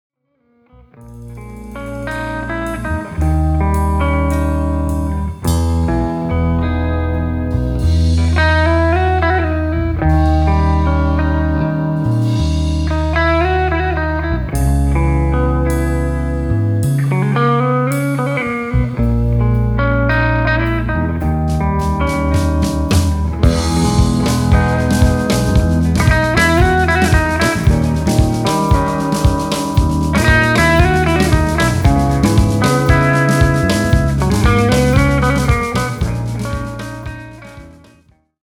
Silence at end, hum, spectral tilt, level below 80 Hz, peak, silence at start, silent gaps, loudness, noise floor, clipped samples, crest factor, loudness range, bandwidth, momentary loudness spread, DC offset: 0.7 s; none; -6.5 dB/octave; -20 dBFS; 0 dBFS; 1 s; none; -15 LUFS; -59 dBFS; under 0.1%; 14 dB; 5 LU; 16 kHz; 7 LU; under 0.1%